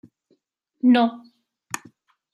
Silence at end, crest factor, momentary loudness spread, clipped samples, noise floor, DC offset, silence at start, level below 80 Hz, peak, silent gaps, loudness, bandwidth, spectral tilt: 1.15 s; 18 dB; 17 LU; under 0.1%; -67 dBFS; under 0.1%; 0.85 s; -76 dBFS; -6 dBFS; none; -20 LUFS; 12.5 kHz; -4 dB/octave